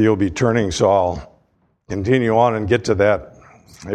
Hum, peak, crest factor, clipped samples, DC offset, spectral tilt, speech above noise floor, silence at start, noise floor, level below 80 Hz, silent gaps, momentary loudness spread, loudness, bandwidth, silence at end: none; -2 dBFS; 16 dB; under 0.1%; under 0.1%; -6 dB/octave; 45 dB; 0 s; -62 dBFS; -42 dBFS; none; 10 LU; -17 LUFS; 10.5 kHz; 0 s